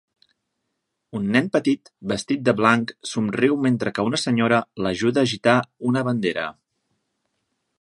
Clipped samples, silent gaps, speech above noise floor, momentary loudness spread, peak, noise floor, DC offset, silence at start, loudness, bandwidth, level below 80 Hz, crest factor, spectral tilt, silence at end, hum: under 0.1%; none; 56 dB; 9 LU; 0 dBFS; -78 dBFS; under 0.1%; 1.15 s; -21 LUFS; 11.5 kHz; -60 dBFS; 22 dB; -5.5 dB/octave; 1.3 s; none